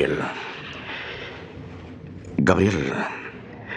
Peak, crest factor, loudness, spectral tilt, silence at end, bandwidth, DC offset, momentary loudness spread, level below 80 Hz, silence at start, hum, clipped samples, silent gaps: -2 dBFS; 24 dB; -25 LUFS; -6 dB/octave; 0 s; 11 kHz; under 0.1%; 20 LU; -50 dBFS; 0 s; none; under 0.1%; none